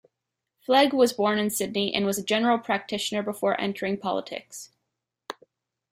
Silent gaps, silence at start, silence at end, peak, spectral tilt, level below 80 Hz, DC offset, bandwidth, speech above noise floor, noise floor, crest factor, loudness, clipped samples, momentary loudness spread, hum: none; 0.7 s; 0.6 s; -8 dBFS; -3.5 dB/octave; -68 dBFS; under 0.1%; 16 kHz; 59 dB; -84 dBFS; 20 dB; -25 LUFS; under 0.1%; 20 LU; none